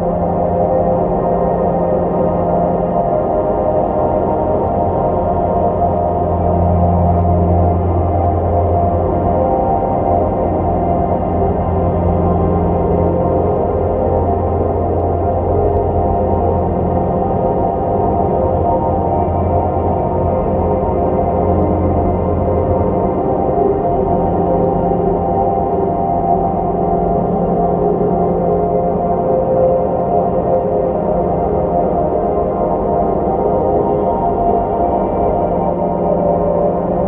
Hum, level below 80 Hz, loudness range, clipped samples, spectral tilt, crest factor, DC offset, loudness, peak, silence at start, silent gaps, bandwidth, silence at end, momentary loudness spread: none; -28 dBFS; 1 LU; under 0.1%; -13.5 dB/octave; 12 dB; under 0.1%; -15 LUFS; -2 dBFS; 0 s; none; 3.4 kHz; 0 s; 2 LU